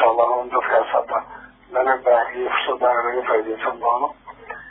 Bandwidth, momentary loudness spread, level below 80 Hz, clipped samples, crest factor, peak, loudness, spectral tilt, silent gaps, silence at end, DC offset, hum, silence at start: 4 kHz; 10 LU; -58 dBFS; under 0.1%; 16 dB; -4 dBFS; -20 LUFS; -7 dB/octave; none; 0 s; under 0.1%; none; 0 s